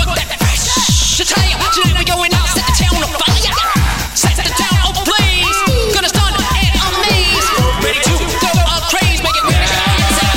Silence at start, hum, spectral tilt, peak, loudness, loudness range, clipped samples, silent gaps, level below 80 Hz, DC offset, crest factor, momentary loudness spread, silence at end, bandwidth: 0 s; none; -3 dB/octave; 0 dBFS; -12 LUFS; 1 LU; under 0.1%; none; -18 dBFS; under 0.1%; 12 dB; 3 LU; 0 s; 16.5 kHz